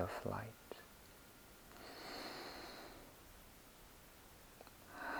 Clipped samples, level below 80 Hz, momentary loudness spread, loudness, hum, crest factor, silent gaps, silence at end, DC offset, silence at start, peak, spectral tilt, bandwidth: under 0.1%; -68 dBFS; 13 LU; -53 LUFS; none; 24 dB; none; 0 s; under 0.1%; 0 s; -28 dBFS; -4 dB/octave; over 20 kHz